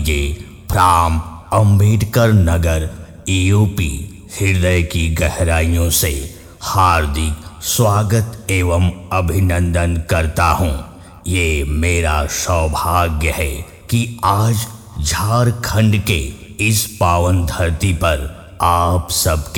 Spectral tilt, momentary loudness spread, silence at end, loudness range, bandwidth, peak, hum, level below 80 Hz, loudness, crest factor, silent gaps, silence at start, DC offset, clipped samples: -5 dB/octave; 9 LU; 0 s; 2 LU; 19 kHz; 0 dBFS; none; -26 dBFS; -16 LUFS; 16 dB; none; 0 s; under 0.1%; under 0.1%